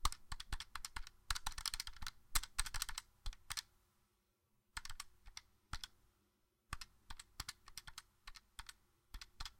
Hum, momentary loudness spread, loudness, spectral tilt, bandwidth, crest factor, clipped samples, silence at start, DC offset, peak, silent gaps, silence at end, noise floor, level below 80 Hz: none; 15 LU; -48 LUFS; 0 dB/octave; 16.5 kHz; 30 dB; under 0.1%; 0 s; under 0.1%; -18 dBFS; none; 0 s; -81 dBFS; -52 dBFS